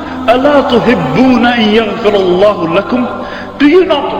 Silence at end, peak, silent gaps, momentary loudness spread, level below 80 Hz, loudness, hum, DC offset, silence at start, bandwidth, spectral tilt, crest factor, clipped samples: 0 s; 0 dBFS; none; 7 LU; -38 dBFS; -9 LUFS; none; under 0.1%; 0 s; 15.5 kHz; -6.5 dB/octave; 10 dB; 0.8%